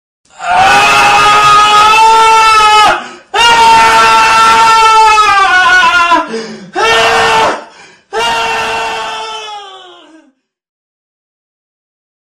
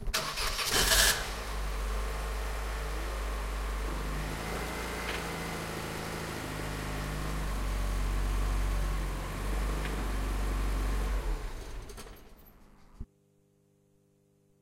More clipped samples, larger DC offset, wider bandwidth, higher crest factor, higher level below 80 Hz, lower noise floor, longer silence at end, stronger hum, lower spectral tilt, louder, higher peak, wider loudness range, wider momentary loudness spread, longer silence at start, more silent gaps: neither; neither; about the same, 15.5 kHz vs 16 kHz; second, 8 dB vs 24 dB; about the same, -38 dBFS vs -36 dBFS; second, -50 dBFS vs -68 dBFS; first, 2.6 s vs 1.6 s; second, none vs 50 Hz at -65 dBFS; second, -1 dB/octave vs -3 dB/octave; first, -6 LUFS vs -33 LUFS; first, 0 dBFS vs -10 dBFS; first, 12 LU vs 9 LU; first, 15 LU vs 11 LU; first, 0.4 s vs 0 s; neither